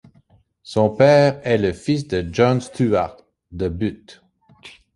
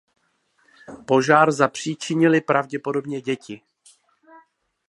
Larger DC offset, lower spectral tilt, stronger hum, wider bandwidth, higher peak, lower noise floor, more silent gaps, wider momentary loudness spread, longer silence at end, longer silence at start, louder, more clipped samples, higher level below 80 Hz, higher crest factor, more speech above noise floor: neither; first, -7 dB/octave vs -5.5 dB/octave; neither; about the same, 11.5 kHz vs 11.5 kHz; about the same, -2 dBFS vs 0 dBFS; second, -56 dBFS vs -66 dBFS; neither; second, 13 LU vs 16 LU; second, 0.25 s vs 1.35 s; second, 0.65 s vs 0.9 s; about the same, -19 LUFS vs -20 LUFS; neither; first, -44 dBFS vs -70 dBFS; about the same, 18 dB vs 22 dB; second, 38 dB vs 46 dB